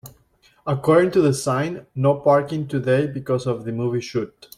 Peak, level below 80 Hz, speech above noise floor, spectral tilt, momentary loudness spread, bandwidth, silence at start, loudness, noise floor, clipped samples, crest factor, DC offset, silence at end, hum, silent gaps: -4 dBFS; -58 dBFS; 38 dB; -6.5 dB/octave; 10 LU; 16 kHz; 0.05 s; -21 LUFS; -58 dBFS; under 0.1%; 16 dB; under 0.1%; 0.3 s; none; none